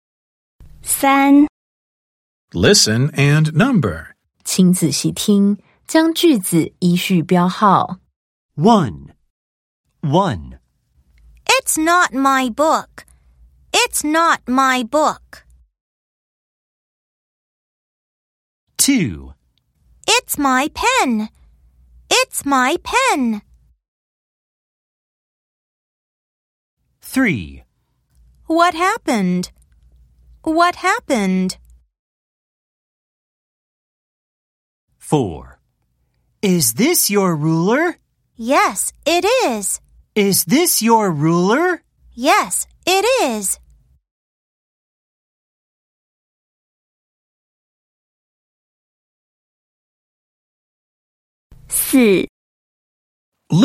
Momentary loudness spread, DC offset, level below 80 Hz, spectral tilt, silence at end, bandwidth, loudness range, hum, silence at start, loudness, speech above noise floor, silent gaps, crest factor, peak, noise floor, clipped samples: 12 LU; under 0.1%; -50 dBFS; -4 dB/octave; 0 s; 16.5 kHz; 10 LU; none; 0.6 s; -16 LUFS; 50 dB; 1.49-2.48 s, 8.16-8.49 s, 9.30-9.84 s, 15.81-18.67 s, 23.88-26.77 s, 31.99-34.88 s, 44.11-51.50 s, 52.29-53.32 s; 18 dB; 0 dBFS; -66 dBFS; under 0.1%